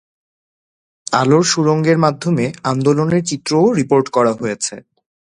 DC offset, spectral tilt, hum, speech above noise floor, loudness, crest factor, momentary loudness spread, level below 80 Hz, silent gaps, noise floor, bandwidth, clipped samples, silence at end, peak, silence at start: under 0.1%; -5.5 dB/octave; none; over 75 dB; -15 LUFS; 16 dB; 8 LU; -56 dBFS; none; under -90 dBFS; 11 kHz; under 0.1%; 0.4 s; 0 dBFS; 1.1 s